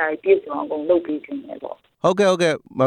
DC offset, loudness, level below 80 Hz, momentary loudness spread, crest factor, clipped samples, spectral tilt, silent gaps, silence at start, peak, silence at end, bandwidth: under 0.1%; -20 LUFS; -64 dBFS; 16 LU; 18 dB; under 0.1%; -5.5 dB/octave; none; 0 s; -4 dBFS; 0 s; 11 kHz